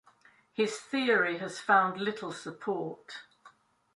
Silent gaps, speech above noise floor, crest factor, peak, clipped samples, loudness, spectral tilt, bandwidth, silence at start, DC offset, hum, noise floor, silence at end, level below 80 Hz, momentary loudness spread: none; 32 dB; 22 dB; -10 dBFS; under 0.1%; -30 LUFS; -4 dB/octave; 11.5 kHz; 0.6 s; under 0.1%; none; -63 dBFS; 0.45 s; -80 dBFS; 18 LU